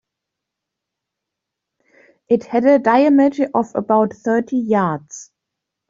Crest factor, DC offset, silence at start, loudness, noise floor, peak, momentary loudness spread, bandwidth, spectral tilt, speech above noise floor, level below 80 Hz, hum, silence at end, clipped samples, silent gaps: 16 dB; under 0.1%; 2.3 s; -16 LUFS; -82 dBFS; -4 dBFS; 9 LU; 7.6 kHz; -6.5 dB/octave; 66 dB; -64 dBFS; none; 0.65 s; under 0.1%; none